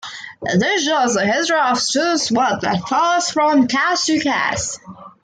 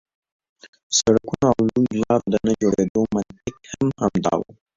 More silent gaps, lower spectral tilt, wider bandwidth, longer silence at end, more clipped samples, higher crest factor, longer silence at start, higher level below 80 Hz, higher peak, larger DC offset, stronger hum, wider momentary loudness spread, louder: second, none vs 2.90-2.95 s; second, -3 dB/octave vs -5 dB/octave; first, 9.8 kHz vs 7.8 kHz; about the same, 0.15 s vs 0.25 s; neither; about the same, 14 dB vs 18 dB; second, 0.05 s vs 0.9 s; second, -56 dBFS vs -50 dBFS; about the same, -4 dBFS vs -4 dBFS; neither; neither; about the same, 6 LU vs 8 LU; first, -17 LUFS vs -21 LUFS